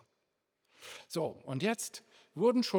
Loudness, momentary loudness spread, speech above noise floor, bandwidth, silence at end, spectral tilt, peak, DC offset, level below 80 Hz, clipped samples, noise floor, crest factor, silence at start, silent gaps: -34 LUFS; 20 LU; 50 dB; over 20 kHz; 0 s; -4.5 dB/octave; -16 dBFS; under 0.1%; -86 dBFS; under 0.1%; -82 dBFS; 18 dB; 0.8 s; none